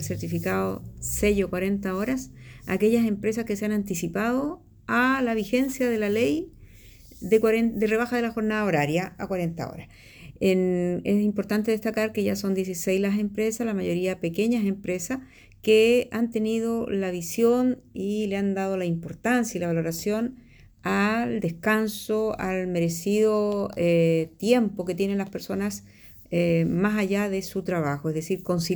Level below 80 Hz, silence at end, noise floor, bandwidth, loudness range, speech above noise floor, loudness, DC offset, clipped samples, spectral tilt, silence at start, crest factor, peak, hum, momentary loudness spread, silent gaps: -52 dBFS; 0 s; -49 dBFS; over 20 kHz; 2 LU; 24 dB; -25 LUFS; under 0.1%; under 0.1%; -5.5 dB/octave; 0 s; 18 dB; -8 dBFS; none; 8 LU; none